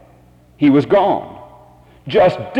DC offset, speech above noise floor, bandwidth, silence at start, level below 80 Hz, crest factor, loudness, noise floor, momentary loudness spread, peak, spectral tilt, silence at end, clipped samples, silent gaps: under 0.1%; 34 dB; 7.6 kHz; 0.6 s; -50 dBFS; 14 dB; -15 LUFS; -48 dBFS; 18 LU; -4 dBFS; -8 dB/octave; 0 s; under 0.1%; none